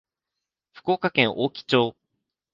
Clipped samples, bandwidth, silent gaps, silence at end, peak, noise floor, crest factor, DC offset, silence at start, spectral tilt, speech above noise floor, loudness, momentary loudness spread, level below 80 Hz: under 0.1%; 7.4 kHz; none; 0.6 s; -2 dBFS; -86 dBFS; 24 dB; under 0.1%; 0.85 s; -6 dB/octave; 63 dB; -23 LUFS; 7 LU; -66 dBFS